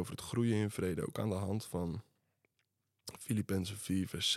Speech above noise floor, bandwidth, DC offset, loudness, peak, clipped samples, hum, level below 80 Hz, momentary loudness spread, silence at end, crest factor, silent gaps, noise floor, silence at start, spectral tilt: 47 dB; 15.5 kHz; under 0.1%; -37 LUFS; -22 dBFS; under 0.1%; none; -68 dBFS; 12 LU; 0 s; 16 dB; none; -83 dBFS; 0 s; -5 dB/octave